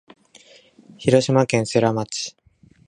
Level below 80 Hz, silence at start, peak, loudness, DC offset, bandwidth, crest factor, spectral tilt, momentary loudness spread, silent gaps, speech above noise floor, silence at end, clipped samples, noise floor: -58 dBFS; 1 s; -2 dBFS; -20 LUFS; under 0.1%; 11 kHz; 20 dB; -5.5 dB/octave; 11 LU; none; 32 dB; 0.6 s; under 0.1%; -51 dBFS